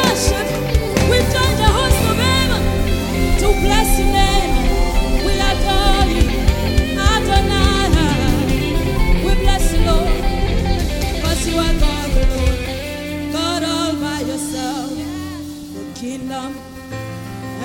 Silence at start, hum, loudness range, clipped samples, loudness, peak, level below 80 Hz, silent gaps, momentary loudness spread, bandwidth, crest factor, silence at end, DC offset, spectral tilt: 0 s; none; 6 LU; under 0.1%; -17 LUFS; 0 dBFS; -18 dBFS; none; 12 LU; 17 kHz; 16 dB; 0 s; under 0.1%; -4.5 dB/octave